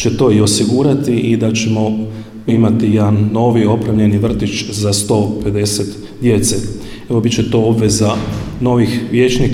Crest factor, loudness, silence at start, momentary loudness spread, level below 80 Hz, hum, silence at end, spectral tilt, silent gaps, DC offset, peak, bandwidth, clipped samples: 12 dB; -14 LUFS; 0 s; 7 LU; -34 dBFS; none; 0 s; -5.5 dB/octave; none; under 0.1%; -2 dBFS; 15.5 kHz; under 0.1%